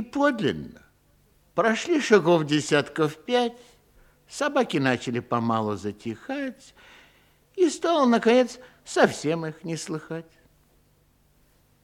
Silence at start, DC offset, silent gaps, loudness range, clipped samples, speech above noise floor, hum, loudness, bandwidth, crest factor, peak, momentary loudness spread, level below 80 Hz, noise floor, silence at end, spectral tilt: 0 s; under 0.1%; none; 4 LU; under 0.1%; 38 dB; none; -24 LUFS; 15.5 kHz; 22 dB; -4 dBFS; 15 LU; -64 dBFS; -63 dBFS; 1.6 s; -5 dB/octave